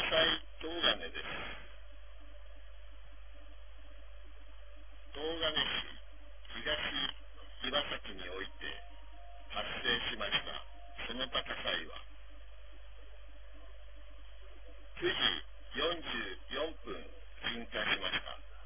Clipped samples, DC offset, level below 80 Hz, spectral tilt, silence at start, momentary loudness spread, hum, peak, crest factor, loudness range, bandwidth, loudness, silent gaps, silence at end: under 0.1%; 0.5%; -54 dBFS; 0 dB/octave; 0 s; 25 LU; none; -14 dBFS; 26 dB; 12 LU; 3.7 kHz; -36 LUFS; none; 0 s